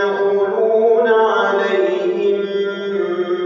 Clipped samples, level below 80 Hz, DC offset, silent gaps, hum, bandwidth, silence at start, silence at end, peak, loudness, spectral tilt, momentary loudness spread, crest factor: under 0.1%; -84 dBFS; under 0.1%; none; none; 7 kHz; 0 s; 0 s; -4 dBFS; -16 LUFS; -6 dB/octave; 7 LU; 12 dB